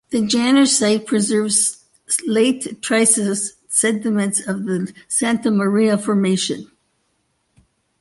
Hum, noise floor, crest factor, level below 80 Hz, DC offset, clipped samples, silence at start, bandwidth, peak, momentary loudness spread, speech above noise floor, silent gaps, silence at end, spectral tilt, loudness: none; -67 dBFS; 18 dB; -62 dBFS; under 0.1%; under 0.1%; 0.1 s; 12 kHz; -2 dBFS; 9 LU; 50 dB; none; 1.35 s; -3.5 dB/octave; -17 LUFS